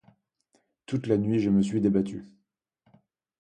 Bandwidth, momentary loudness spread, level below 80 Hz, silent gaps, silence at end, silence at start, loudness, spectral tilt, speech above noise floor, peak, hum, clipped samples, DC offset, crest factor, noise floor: 9.2 kHz; 10 LU; -58 dBFS; none; 1.15 s; 0.9 s; -26 LUFS; -8 dB/octave; 50 dB; -10 dBFS; none; under 0.1%; under 0.1%; 18 dB; -75 dBFS